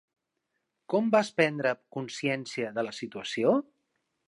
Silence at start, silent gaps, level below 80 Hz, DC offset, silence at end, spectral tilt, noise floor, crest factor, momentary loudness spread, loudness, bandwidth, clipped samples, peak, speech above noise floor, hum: 0.9 s; none; -80 dBFS; under 0.1%; 0.65 s; -5 dB/octave; -82 dBFS; 22 dB; 10 LU; -29 LUFS; 11.5 kHz; under 0.1%; -10 dBFS; 53 dB; none